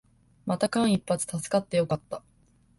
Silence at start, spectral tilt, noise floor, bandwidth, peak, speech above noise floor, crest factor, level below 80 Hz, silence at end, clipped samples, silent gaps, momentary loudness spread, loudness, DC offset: 0.45 s; -5.5 dB/octave; -62 dBFS; 12 kHz; -10 dBFS; 36 dB; 18 dB; -60 dBFS; 0.6 s; under 0.1%; none; 15 LU; -27 LUFS; under 0.1%